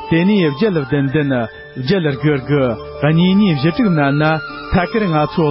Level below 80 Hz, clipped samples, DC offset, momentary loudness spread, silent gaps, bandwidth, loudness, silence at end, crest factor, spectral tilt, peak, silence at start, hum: -38 dBFS; under 0.1%; under 0.1%; 6 LU; none; 5.8 kHz; -15 LUFS; 0 s; 12 dB; -12 dB/octave; -2 dBFS; 0 s; none